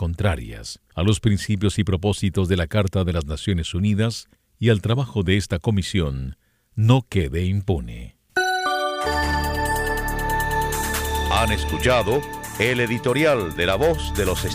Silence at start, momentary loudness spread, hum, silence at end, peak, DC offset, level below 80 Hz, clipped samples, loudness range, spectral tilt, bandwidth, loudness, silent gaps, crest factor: 0 s; 7 LU; none; 0 s; -2 dBFS; under 0.1%; -32 dBFS; under 0.1%; 2 LU; -5.5 dB/octave; 16 kHz; -22 LUFS; none; 20 dB